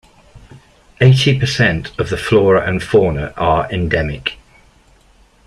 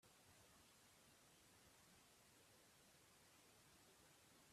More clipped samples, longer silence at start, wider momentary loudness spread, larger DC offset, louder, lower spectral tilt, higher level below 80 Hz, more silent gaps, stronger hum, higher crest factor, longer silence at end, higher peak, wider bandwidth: neither; first, 0.35 s vs 0 s; first, 10 LU vs 0 LU; neither; first, -15 LUFS vs -70 LUFS; first, -6 dB/octave vs -2.5 dB/octave; first, -36 dBFS vs -90 dBFS; neither; neither; about the same, 16 dB vs 14 dB; first, 1.1 s vs 0 s; first, -2 dBFS vs -58 dBFS; second, 11.5 kHz vs 14.5 kHz